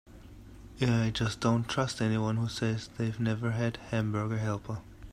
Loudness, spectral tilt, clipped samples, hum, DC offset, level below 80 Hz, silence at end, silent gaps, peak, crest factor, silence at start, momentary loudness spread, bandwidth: -31 LUFS; -6 dB/octave; under 0.1%; none; under 0.1%; -52 dBFS; 0 s; none; -14 dBFS; 18 dB; 0.05 s; 11 LU; 11.5 kHz